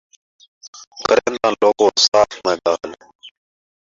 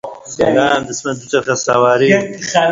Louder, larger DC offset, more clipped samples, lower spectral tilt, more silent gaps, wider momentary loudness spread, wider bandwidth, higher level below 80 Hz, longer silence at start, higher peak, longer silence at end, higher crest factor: about the same, -16 LUFS vs -14 LUFS; neither; neither; second, -2 dB/octave vs -4 dB/octave; first, 0.68-0.73 s, 0.87-0.91 s, 2.08-2.12 s, 3.15-3.19 s vs none; first, 12 LU vs 9 LU; about the same, 7.8 kHz vs 7.8 kHz; second, -56 dBFS vs -50 dBFS; first, 0.65 s vs 0.05 s; about the same, 0 dBFS vs 0 dBFS; first, 0.7 s vs 0 s; about the same, 18 dB vs 14 dB